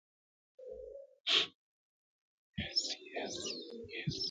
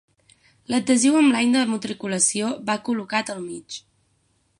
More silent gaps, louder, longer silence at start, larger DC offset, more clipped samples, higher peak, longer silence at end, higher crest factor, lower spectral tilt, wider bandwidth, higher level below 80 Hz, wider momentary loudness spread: first, 1.20-1.24 s, 1.55-2.53 s vs none; second, -36 LUFS vs -21 LUFS; about the same, 0.6 s vs 0.7 s; neither; neither; second, -16 dBFS vs -6 dBFS; second, 0 s vs 0.8 s; first, 24 dB vs 18 dB; about the same, -2.5 dB/octave vs -3 dB/octave; second, 9.6 kHz vs 11.5 kHz; about the same, -64 dBFS vs -68 dBFS; first, 20 LU vs 16 LU